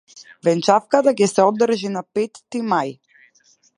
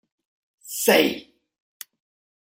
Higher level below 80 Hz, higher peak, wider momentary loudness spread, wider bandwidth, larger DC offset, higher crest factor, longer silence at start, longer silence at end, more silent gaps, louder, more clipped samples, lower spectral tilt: about the same, -72 dBFS vs -68 dBFS; about the same, 0 dBFS vs -2 dBFS; second, 9 LU vs 25 LU; second, 11.5 kHz vs 16 kHz; neither; second, 18 dB vs 24 dB; second, 0.15 s vs 0.65 s; second, 0.85 s vs 1.2 s; neither; about the same, -19 LUFS vs -20 LUFS; neither; first, -5 dB/octave vs -2.5 dB/octave